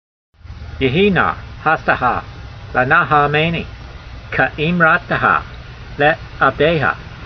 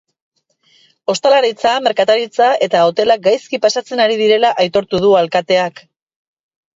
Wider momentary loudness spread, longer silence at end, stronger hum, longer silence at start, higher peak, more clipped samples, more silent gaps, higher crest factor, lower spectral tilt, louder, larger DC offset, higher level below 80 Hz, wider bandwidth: first, 21 LU vs 4 LU; second, 0 s vs 1.05 s; neither; second, 0.45 s vs 1.1 s; about the same, 0 dBFS vs 0 dBFS; neither; neither; about the same, 16 dB vs 14 dB; first, -7.5 dB/octave vs -3.5 dB/octave; about the same, -15 LUFS vs -14 LUFS; neither; first, -36 dBFS vs -58 dBFS; second, 6.4 kHz vs 7.8 kHz